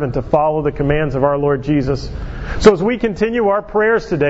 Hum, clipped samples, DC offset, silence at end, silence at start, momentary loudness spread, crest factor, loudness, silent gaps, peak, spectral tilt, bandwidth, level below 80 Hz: none; 0.1%; under 0.1%; 0 s; 0 s; 9 LU; 16 dB; -16 LUFS; none; 0 dBFS; -7 dB/octave; 8 kHz; -30 dBFS